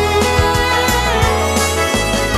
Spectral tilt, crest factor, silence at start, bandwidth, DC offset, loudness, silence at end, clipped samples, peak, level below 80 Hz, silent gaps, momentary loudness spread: -3.5 dB/octave; 14 dB; 0 s; 14 kHz; under 0.1%; -14 LUFS; 0 s; under 0.1%; 0 dBFS; -24 dBFS; none; 1 LU